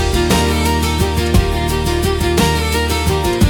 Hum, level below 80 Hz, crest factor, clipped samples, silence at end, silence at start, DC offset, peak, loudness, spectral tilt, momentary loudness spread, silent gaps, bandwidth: none; -22 dBFS; 14 dB; under 0.1%; 0 s; 0 s; under 0.1%; 0 dBFS; -15 LUFS; -5 dB/octave; 3 LU; none; 18 kHz